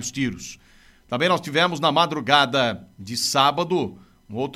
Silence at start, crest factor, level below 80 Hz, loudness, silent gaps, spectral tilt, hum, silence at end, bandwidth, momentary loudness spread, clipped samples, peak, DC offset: 0 s; 22 dB; -58 dBFS; -21 LUFS; none; -3.5 dB/octave; none; 0 s; 15.5 kHz; 15 LU; under 0.1%; -2 dBFS; under 0.1%